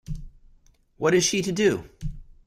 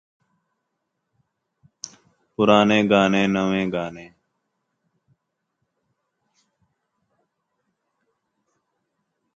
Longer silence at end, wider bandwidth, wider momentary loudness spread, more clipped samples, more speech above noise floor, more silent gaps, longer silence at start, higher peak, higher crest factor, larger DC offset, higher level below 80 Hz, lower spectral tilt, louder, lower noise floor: second, 0.2 s vs 5.3 s; first, 15 kHz vs 7.6 kHz; second, 18 LU vs 23 LU; neither; second, 35 dB vs 59 dB; neither; second, 0.1 s vs 2.4 s; second, -8 dBFS vs -2 dBFS; second, 18 dB vs 24 dB; neither; first, -42 dBFS vs -60 dBFS; second, -4 dB/octave vs -5.5 dB/octave; second, -23 LUFS vs -19 LUFS; second, -57 dBFS vs -78 dBFS